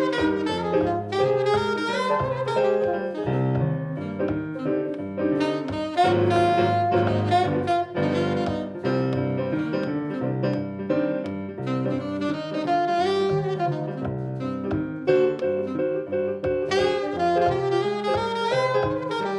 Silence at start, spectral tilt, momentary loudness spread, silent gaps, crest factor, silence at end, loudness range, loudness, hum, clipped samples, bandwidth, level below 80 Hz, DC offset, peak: 0 s; -7 dB/octave; 7 LU; none; 16 dB; 0 s; 4 LU; -24 LUFS; none; under 0.1%; 11 kHz; -52 dBFS; under 0.1%; -8 dBFS